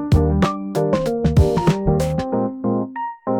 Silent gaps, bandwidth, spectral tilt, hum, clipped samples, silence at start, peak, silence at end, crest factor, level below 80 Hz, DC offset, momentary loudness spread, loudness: none; 17.5 kHz; -8 dB/octave; none; under 0.1%; 0 s; -4 dBFS; 0 s; 14 dB; -30 dBFS; under 0.1%; 6 LU; -19 LUFS